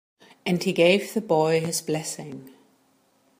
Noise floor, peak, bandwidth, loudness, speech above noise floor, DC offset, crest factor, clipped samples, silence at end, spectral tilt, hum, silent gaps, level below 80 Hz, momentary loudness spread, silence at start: -64 dBFS; -6 dBFS; 15.5 kHz; -23 LUFS; 41 dB; under 0.1%; 20 dB; under 0.1%; 0.9 s; -4.5 dB/octave; none; none; -72 dBFS; 16 LU; 0.45 s